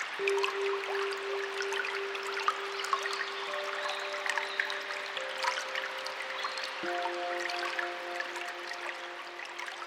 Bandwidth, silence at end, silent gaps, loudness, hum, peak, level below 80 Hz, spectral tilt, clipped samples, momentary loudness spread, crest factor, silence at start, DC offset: 16 kHz; 0 s; none; -34 LUFS; none; -12 dBFS; -88 dBFS; -0.5 dB/octave; under 0.1%; 6 LU; 22 dB; 0 s; under 0.1%